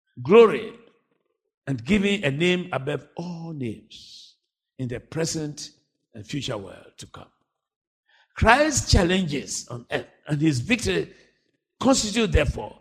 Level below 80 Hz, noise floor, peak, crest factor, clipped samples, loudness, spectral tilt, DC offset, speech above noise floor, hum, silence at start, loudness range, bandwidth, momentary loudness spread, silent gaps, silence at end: -38 dBFS; -74 dBFS; -2 dBFS; 24 dB; under 0.1%; -23 LUFS; -4.5 dB/octave; under 0.1%; 51 dB; none; 0.15 s; 11 LU; 15 kHz; 23 LU; 1.54-1.62 s, 7.76-7.81 s, 7.87-8.03 s; 0.1 s